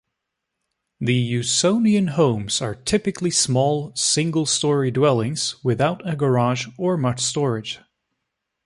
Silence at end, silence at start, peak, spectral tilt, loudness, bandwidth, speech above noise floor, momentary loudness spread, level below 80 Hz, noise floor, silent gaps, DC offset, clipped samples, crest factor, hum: 0.9 s; 1 s; -4 dBFS; -4.5 dB/octave; -20 LUFS; 11.5 kHz; 60 dB; 6 LU; -54 dBFS; -80 dBFS; none; under 0.1%; under 0.1%; 16 dB; none